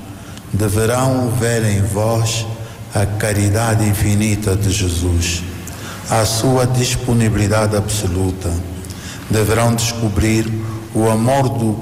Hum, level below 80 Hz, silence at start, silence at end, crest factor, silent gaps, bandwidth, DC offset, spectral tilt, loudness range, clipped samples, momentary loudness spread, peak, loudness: none; -32 dBFS; 0 s; 0 s; 8 dB; none; 16 kHz; under 0.1%; -5 dB/octave; 1 LU; under 0.1%; 11 LU; -8 dBFS; -16 LUFS